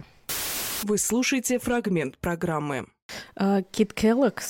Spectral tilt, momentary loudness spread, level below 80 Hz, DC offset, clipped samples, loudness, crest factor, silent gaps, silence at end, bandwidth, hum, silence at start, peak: -4 dB/octave; 10 LU; -52 dBFS; under 0.1%; under 0.1%; -26 LUFS; 16 dB; 3.02-3.09 s; 0 s; 17 kHz; none; 0 s; -10 dBFS